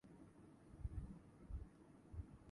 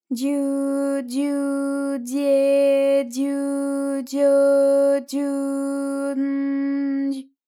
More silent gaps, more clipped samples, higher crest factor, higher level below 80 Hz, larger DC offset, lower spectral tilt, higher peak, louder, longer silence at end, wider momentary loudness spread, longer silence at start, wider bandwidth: neither; neither; first, 20 dB vs 12 dB; first, -58 dBFS vs under -90 dBFS; neither; first, -8.5 dB/octave vs -4 dB/octave; second, -34 dBFS vs -10 dBFS; second, -57 LUFS vs -21 LUFS; second, 0 s vs 0.25 s; first, 12 LU vs 8 LU; about the same, 0.05 s vs 0.1 s; second, 11 kHz vs 15 kHz